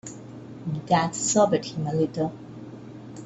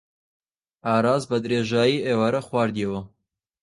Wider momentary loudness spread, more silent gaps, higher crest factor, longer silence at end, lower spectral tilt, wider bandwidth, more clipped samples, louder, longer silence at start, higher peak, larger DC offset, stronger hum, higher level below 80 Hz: first, 20 LU vs 8 LU; neither; about the same, 20 dB vs 18 dB; second, 0 s vs 0.55 s; about the same, -5 dB/octave vs -6 dB/octave; second, 8.4 kHz vs 11.5 kHz; neither; about the same, -24 LUFS vs -23 LUFS; second, 0.05 s vs 0.85 s; about the same, -6 dBFS vs -6 dBFS; neither; neither; about the same, -60 dBFS vs -58 dBFS